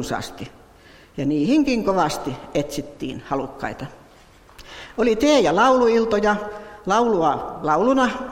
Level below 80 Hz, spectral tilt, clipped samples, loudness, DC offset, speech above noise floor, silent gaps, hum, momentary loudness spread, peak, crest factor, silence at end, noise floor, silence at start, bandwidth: -48 dBFS; -5 dB/octave; under 0.1%; -20 LUFS; under 0.1%; 29 dB; none; none; 18 LU; -6 dBFS; 16 dB; 0 s; -49 dBFS; 0 s; 16.5 kHz